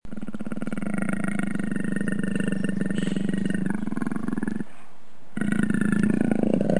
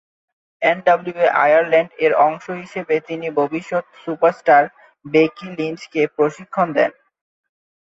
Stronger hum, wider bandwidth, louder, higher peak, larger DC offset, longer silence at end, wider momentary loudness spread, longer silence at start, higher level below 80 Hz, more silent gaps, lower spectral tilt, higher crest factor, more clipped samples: neither; first, 10.5 kHz vs 7.8 kHz; second, -27 LUFS vs -18 LUFS; second, -8 dBFS vs -2 dBFS; first, 4% vs under 0.1%; second, 0 s vs 0.9 s; about the same, 10 LU vs 11 LU; second, 0 s vs 0.6 s; first, -54 dBFS vs -68 dBFS; neither; about the same, -7 dB/octave vs -6 dB/octave; about the same, 20 dB vs 16 dB; neither